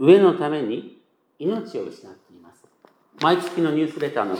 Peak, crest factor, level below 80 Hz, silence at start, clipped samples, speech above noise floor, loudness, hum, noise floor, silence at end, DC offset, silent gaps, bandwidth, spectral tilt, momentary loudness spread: -2 dBFS; 20 dB; -82 dBFS; 0 s; under 0.1%; 37 dB; -22 LUFS; none; -57 dBFS; 0 s; under 0.1%; none; 11.5 kHz; -7 dB/octave; 16 LU